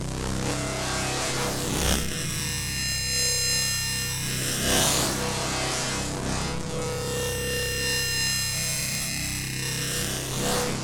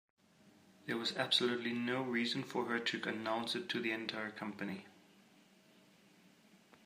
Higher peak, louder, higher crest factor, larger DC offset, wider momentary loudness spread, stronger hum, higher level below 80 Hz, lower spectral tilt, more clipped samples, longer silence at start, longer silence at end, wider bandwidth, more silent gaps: first, -10 dBFS vs -18 dBFS; first, -25 LUFS vs -37 LUFS; about the same, 18 dB vs 22 dB; neither; second, 7 LU vs 11 LU; neither; first, -40 dBFS vs -88 dBFS; second, -2.5 dB/octave vs -4 dB/octave; neither; second, 0 s vs 0.45 s; second, 0 s vs 0.3 s; first, 19.5 kHz vs 15.5 kHz; neither